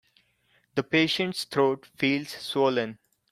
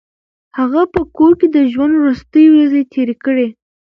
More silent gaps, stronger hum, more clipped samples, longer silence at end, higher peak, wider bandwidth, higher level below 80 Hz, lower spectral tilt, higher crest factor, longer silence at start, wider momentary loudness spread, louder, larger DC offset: neither; neither; neither; about the same, 0.4 s vs 0.35 s; second, -8 dBFS vs 0 dBFS; first, 15.5 kHz vs 5.4 kHz; second, -70 dBFS vs -46 dBFS; second, -5 dB/octave vs -8 dB/octave; first, 20 dB vs 12 dB; first, 0.75 s vs 0.55 s; about the same, 8 LU vs 9 LU; second, -26 LUFS vs -12 LUFS; neither